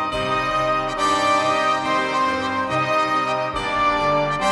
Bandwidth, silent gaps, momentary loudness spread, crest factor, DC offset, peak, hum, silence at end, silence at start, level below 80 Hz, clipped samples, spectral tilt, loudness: 11.5 kHz; none; 4 LU; 12 dB; under 0.1%; -8 dBFS; none; 0 s; 0 s; -44 dBFS; under 0.1%; -4 dB/octave; -20 LUFS